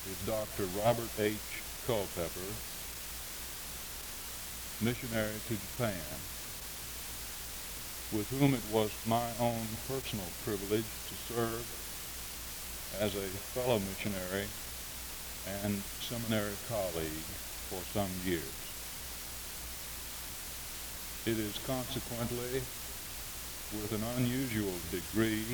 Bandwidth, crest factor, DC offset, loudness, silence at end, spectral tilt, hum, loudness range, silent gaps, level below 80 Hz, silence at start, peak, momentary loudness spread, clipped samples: over 20 kHz; 24 dB; under 0.1%; -36 LUFS; 0 s; -4 dB/octave; none; 4 LU; none; -52 dBFS; 0 s; -14 dBFS; 8 LU; under 0.1%